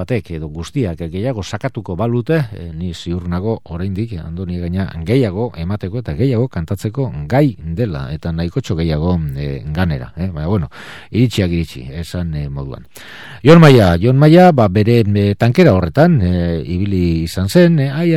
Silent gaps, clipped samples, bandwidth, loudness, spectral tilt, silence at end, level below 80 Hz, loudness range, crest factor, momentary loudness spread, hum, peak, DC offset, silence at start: none; 0.2%; 13.5 kHz; -15 LUFS; -7.5 dB/octave; 0 s; -34 dBFS; 10 LU; 14 dB; 15 LU; none; 0 dBFS; 0.9%; 0 s